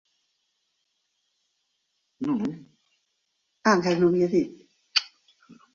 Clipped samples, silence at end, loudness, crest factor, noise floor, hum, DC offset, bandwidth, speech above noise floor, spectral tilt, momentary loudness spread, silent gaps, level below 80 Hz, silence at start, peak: under 0.1%; 0.2 s; -25 LUFS; 22 dB; -76 dBFS; none; under 0.1%; 7.4 kHz; 53 dB; -5 dB/octave; 13 LU; none; -68 dBFS; 2.2 s; -6 dBFS